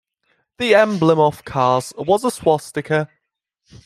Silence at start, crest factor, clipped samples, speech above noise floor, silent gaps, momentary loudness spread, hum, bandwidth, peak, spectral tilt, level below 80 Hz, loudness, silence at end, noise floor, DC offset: 0.6 s; 16 dB; under 0.1%; 59 dB; none; 7 LU; none; 14.5 kHz; -2 dBFS; -5.5 dB/octave; -56 dBFS; -18 LUFS; 0.8 s; -76 dBFS; under 0.1%